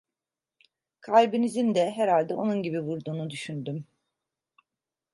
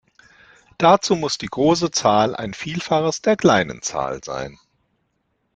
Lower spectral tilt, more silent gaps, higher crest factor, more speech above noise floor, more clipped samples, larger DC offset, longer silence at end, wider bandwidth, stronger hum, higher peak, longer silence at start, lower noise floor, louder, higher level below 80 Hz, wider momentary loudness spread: first, -6.5 dB/octave vs -4.5 dB/octave; neither; about the same, 22 dB vs 20 dB; first, 64 dB vs 51 dB; neither; neither; first, 1.3 s vs 1.05 s; first, 11.5 kHz vs 9.2 kHz; neither; second, -6 dBFS vs -2 dBFS; first, 1.05 s vs 0.8 s; first, -90 dBFS vs -70 dBFS; second, -26 LUFS vs -19 LUFS; second, -78 dBFS vs -54 dBFS; about the same, 13 LU vs 12 LU